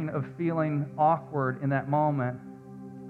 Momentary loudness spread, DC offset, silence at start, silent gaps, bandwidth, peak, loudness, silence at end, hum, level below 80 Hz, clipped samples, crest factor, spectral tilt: 18 LU; under 0.1%; 0 s; none; 4.3 kHz; -12 dBFS; -28 LUFS; 0 s; none; -66 dBFS; under 0.1%; 16 dB; -10.5 dB/octave